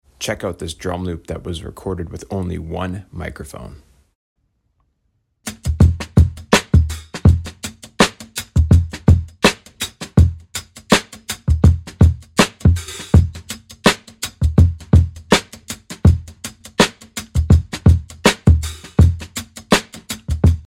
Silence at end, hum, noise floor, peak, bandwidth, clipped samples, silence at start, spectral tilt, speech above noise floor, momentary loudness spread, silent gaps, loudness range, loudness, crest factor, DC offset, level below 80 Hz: 0.15 s; none; -67 dBFS; 0 dBFS; 16 kHz; under 0.1%; 0.2 s; -5.5 dB/octave; 42 dB; 15 LU; 4.15-4.36 s; 11 LU; -17 LUFS; 16 dB; under 0.1%; -24 dBFS